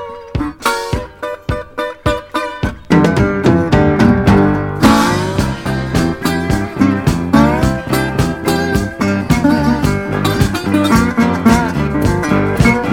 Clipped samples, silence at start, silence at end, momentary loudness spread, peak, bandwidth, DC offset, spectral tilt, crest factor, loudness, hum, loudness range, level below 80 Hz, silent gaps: 0.1%; 0 s; 0 s; 10 LU; 0 dBFS; 19 kHz; under 0.1%; -6 dB/octave; 14 dB; -14 LUFS; none; 3 LU; -28 dBFS; none